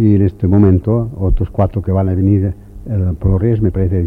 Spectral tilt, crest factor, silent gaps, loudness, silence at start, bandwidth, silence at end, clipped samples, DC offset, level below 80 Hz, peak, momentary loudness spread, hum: -12 dB/octave; 12 dB; none; -15 LUFS; 0 s; 2.9 kHz; 0 s; under 0.1%; under 0.1%; -24 dBFS; 0 dBFS; 7 LU; none